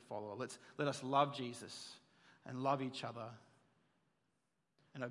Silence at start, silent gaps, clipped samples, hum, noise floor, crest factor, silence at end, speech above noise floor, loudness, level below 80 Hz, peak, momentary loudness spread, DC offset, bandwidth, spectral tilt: 0 s; none; under 0.1%; none; -85 dBFS; 24 dB; 0 s; 44 dB; -42 LUFS; under -90 dBFS; -20 dBFS; 18 LU; under 0.1%; 11.5 kHz; -5 dB/octave